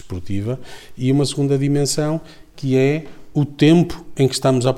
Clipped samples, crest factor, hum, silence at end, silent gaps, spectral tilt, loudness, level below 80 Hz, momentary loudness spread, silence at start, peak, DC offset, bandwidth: under 0.1%; 16 dB; none; 0 s; none; -6 dB/octave; -19 LUFS; -44 dBFS; 13 LU; 0.05 s; -2 dBFS; under 0.1%; 14 kHz